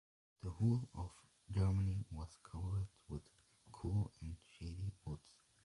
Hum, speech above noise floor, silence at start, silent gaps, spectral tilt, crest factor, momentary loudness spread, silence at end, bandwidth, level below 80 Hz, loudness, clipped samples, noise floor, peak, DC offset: none; 22 dB; 0.45 s; none; -8 dB/octave; 18 dB; 14 LU; 0.45 s; 11.5 kHz; -54 dBFS; -43 LUFS; under 0.1%; -62 dBFS; -24 dBFS; under 0.1%